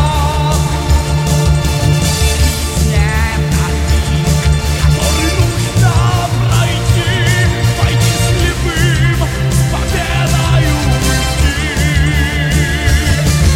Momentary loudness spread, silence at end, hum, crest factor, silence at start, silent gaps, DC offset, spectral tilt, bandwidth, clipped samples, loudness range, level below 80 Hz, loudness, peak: 2 LU; 0 s; none; 10 dB; 0 s; none; under 0.1%; -4.5 dB/octave; 16.5 kHz; under 0.1%; 1 LU; -16 dBFS; -13 LUFS; -2 dBFS